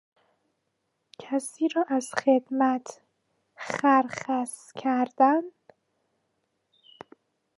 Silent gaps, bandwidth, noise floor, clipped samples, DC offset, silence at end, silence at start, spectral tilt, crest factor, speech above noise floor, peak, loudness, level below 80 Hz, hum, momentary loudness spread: none; 11.5 kHz; -78 dBFS; under 0.1%; under 0.1%; 2.1 s; 1.2 s; -4 dB/octave; 22 dB; 53 dB; -8 dBFS; -26 LUFS; -78 dBFS; none; 12 LU